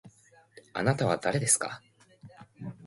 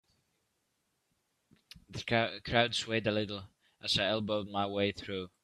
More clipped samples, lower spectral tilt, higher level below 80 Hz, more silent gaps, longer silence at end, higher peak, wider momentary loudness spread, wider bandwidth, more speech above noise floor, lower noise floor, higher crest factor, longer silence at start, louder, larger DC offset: neither; about the same, -4 dB/octave vs -4.5 dB/octave; about the same, -64 dBFS vs -62 dBFS; neither; second, 0 s vs 0.15 s; about the same, -10 dBFS vs -10 dBFS; first, 20 LU vs 12 LU; about the same, 12 kHz vs 13 kHz; second, 32 dB vs 47 dB; second, -59 dBFS vs -80 dBFS; about the same, 22 dB vs 24 dB; second, 0.05 s vs 1.9 s; first, -28 LUFS vs -32 LUFS; neither